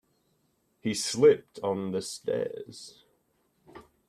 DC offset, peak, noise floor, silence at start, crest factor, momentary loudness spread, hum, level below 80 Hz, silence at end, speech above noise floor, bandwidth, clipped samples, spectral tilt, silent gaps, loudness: under 0.1%; -10 dBFS; -72 dBFS; 0.85 s; 20 dB; 21 LU; none; -70 dBFS; 0.25 s; 44 dB; 14 kHz; under 0.1%; -4.5 dB/octave; none; -28 LUFS